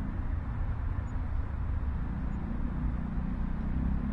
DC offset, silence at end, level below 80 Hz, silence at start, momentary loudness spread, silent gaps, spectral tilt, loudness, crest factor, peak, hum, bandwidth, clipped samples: under 0.1%; 0 s; -34 dBFS; 0 s; 3 LU; none; -10 dB/octave; -35 LUFS; 12 dB; -20 dBFS; none; 4.3 kHz; under 0.1%